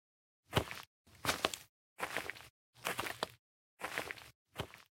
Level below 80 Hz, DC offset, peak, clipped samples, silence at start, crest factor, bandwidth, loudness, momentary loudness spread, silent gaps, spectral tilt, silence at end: -64 dBFS; under 0.1%; -10 dBFS; under 0.1%; 0.5 s; 34 dB; 16.5 kHz; -41 LUFS; 14 LU; 0.87-1.05 s, 1.69-1.96 s, 2.50-2.73 s, 3.39-3.77 s, 4.35-4.45 s; -3 dB/octave; 0.15 s